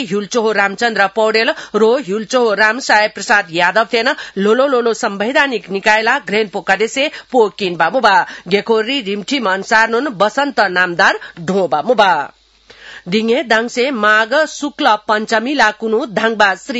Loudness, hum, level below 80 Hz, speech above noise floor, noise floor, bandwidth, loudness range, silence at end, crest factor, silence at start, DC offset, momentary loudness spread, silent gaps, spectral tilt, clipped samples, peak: -14 LUFS; none; -58 dBFS; 29 dB; -43 dBFS; 8 kHz; 2 LU; 0 s; 14 dB; 0 s; under 0.1%; 6 LU; none; -3.5 dB/octave; under 0.1%; 0 dBFS